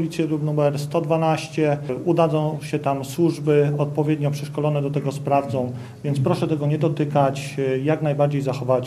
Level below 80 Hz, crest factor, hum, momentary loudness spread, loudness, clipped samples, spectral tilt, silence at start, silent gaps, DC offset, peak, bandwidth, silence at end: -60 dBFS; 16 dB; none; 6 LU; -22 LUFS; under 0.1%; -7.5 dB/octave; 0 s; none; under 0.1%; -4 dBFS; 14 kHz; 0 s